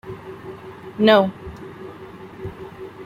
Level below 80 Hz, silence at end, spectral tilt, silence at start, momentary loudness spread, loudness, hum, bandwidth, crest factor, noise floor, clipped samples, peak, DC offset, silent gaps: -52 dBFS; 0 s; -7 dB/octave; 0.05 s; 23 LU; -17 LUFS; none; 15.5 kHz; 22 dB; -39 dBFS; under 0.1%; -2 dBFS; under 0.1%; none